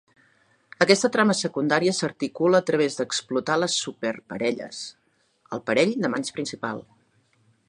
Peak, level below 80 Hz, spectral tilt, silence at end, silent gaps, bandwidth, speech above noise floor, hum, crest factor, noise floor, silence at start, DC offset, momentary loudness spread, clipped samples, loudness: -2 dBFS; -70 dBFS; -4 dB/octave; 0.85 s; none; 11.5 kHz; 41 dB; none; 24 dB; -64 dBFS; 0.8 s; under 0.1%; 13 LU; under 0.1%; -24 LUFS